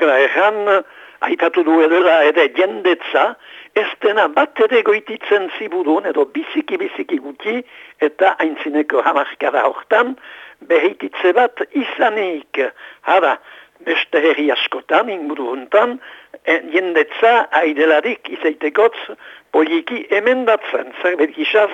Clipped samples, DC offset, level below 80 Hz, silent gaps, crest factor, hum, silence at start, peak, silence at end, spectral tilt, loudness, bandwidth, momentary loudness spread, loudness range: under 0.1%; under 0.1%; -72 dBFS; none; 16 dB; none; 0 s; 0 dBFS; 0 s; -4.5 dB/octave; -16 LUFS; 7.8 kHz; 10 LU; 4 LU